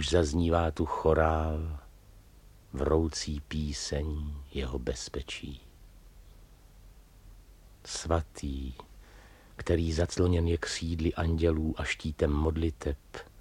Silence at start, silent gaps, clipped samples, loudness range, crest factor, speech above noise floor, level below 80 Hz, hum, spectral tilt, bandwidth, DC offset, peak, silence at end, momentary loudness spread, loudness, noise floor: 0 s; none; under 0.1%; 10 LU; 20 dB; 25 dB; -38 dBFS; none; -5.5 dB/octave; 11.5 kHz; under 0.1%; -10 dBFS; 0 s; 13 LU; -31 LUFS; -55 dBFS